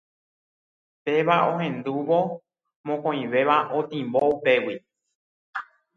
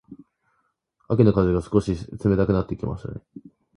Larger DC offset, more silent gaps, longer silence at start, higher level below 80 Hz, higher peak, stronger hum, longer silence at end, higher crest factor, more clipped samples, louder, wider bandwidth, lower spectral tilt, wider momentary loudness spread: neither; first, 2.76-2.84 s, 5.15-5.53 s vs none; first, 1.05 s vs 0.1 s; second, -72 dBFS vs -40 dBFS; about the same, -6 dBFS vs -4 dBFS; neither; about the same, 0.35 s vs 0.4 s; about the same, 20 dB vs 20 dB; neither; about the same, -24 LUFS vs -22 LUFS; second, 6.6 kHz vs 11 kHz; second, -7.5 dB/octave vs -9 dB/octave; about the same, 15 LU vs 15 LU